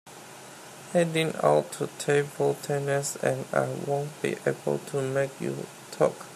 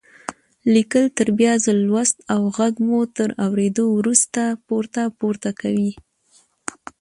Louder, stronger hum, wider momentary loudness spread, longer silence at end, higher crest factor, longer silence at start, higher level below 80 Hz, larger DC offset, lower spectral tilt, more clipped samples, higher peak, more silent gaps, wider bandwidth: second, -28 LUFS vs -19 LUFS; neither; about the same, 16 LU vs 15 LU; second, 0 s vs 1 s; about the same, 20 dB vs 20 dB; second, 0.05 s vs 0.3 s; second, -72 dBFS vs -60 dBFS; neither; about the same, -5 dB/octave vs -4.5 dB/octave; neither; second, -8 dBFS vs 0 dBFS; neither; first, 15 kHz vs 11.5 kHz